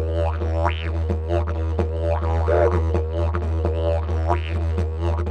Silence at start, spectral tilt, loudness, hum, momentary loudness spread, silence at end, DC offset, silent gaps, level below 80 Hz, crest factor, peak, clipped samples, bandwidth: 0 s; -8.5 dB/octave; -23 LUFS; none; 5 LU; 0 s; under 0.1%; none; -26 dBFS; 16 dB; -6 dBFS; under 0.1%; 6 kHz